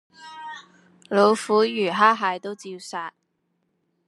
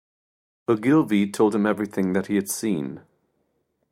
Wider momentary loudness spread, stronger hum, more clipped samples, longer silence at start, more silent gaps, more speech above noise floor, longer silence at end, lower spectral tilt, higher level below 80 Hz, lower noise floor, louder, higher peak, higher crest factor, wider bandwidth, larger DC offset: first, 20 LU vs 11 LU; neither; neither; second, 0.2 s vs 0.7 s; neither; about the same, 51 dB vs 50 dB; about the same, 1 s vs 0.95 s; second, -4.5 dB/octave vs -6 dB/octave; second, -84 dBFS vs -68 dBFS; about the same, -73 dBFS vs -72 dBFS; about the same, -21 LUFS vs -23 LUFS; first, -2 dBFS vs -6 dBFS; about the same, 22 dB vs 18 dB; second, 12 kHz vs 16 kHz; neither